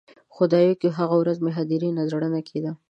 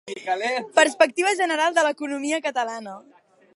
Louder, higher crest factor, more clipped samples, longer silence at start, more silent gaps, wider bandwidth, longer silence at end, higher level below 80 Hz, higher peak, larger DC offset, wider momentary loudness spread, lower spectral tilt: about the same, -23 LUFS vs -22 LUFS; second, 16 dB vs 22 dB; neither; first, 0.35 s vs 0.05 s; neither; second, 7.6 kHz vs 11.5 kHz; second, 0.15 s vs 0.55 s; first, -74 dBFS vs -82 dBFS; second, -6 dBFS vs -2 dBFS; neither; about the same, 8 LU vs 10 LU; first, -9 dB/octave vs -1.5 dB/octave